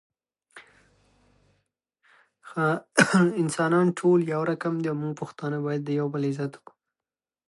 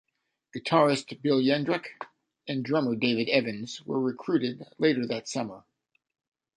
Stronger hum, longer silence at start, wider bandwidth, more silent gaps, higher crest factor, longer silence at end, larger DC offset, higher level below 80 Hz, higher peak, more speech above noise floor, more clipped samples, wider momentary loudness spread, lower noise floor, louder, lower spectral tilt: neither; about the same, 0.55 s vs 0.55 s; about the same, 11.5 kHz vs 10.5 kHz; neither; first, 26 dB vs 20 dB; about the same, 0.9 s vs 1 s; neither; about the same, -74 dBFS vs -72 dBFS; first, -2 dBFS vs -8 dBFS; first, over 65 dB vs 37 dB; neither; about the same, 12 LU vs 14 LU; first, under -90 dBFS vs -64 dBFS; about the same, -25 LUFS vs -27 LUFS; about the same, -6 dB/octave vs -5.5 dB/octave